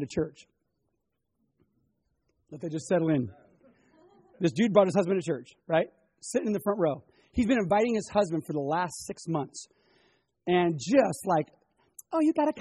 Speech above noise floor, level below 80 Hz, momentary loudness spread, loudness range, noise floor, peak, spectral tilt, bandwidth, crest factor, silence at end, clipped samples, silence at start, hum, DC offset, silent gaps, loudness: 53 dB; -58 dBFS; 14 LU; 6 LU; -80 dBFS; -8 dBFS; -6 dB/octave; 11.5 kHz; 22 dB; 0 s; under 0.1%; 0 s; none; under 0.1%; none; -28 LUFS